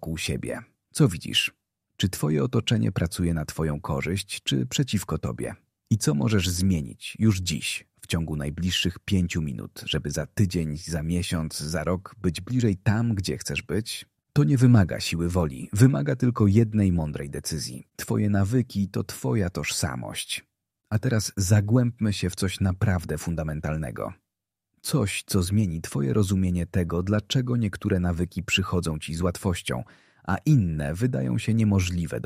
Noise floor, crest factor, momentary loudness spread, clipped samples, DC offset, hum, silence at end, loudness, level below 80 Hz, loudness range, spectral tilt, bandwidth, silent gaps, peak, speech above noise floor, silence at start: -86 dBFS; 22 dB; 9 LU; under 0.1%; under 0.1%; none; 0 s; -26 LUFS; -44 dBFS; 4 LU; -5.5 dB/octave; 15.5 kHz; none; -4 dBFS; 61 dB; 0 s